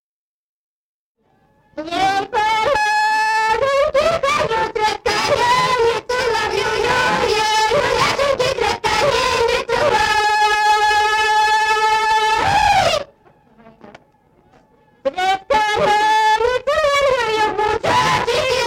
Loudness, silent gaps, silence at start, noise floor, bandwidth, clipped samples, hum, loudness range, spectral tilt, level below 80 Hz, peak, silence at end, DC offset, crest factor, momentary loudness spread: -16 LUFS; none; 1.75 s; -62 dBFS; 17 kHz; under 0.1%; none; 5 LU; -2.5 dB/octave; -42 dBFS; -6 dBFS; 0 s; under 0.1%; 12 dB; 5 LU